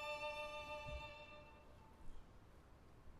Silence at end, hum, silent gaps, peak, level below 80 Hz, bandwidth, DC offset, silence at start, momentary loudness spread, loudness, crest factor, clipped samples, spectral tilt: 0 s; none; none; -36 dBFS; -62 dBFS; 13.5 kHz; under 0.1%; 0 s; 20 LU; -50 LUFS; 16 dB; under 0.1%; -4 dB/octave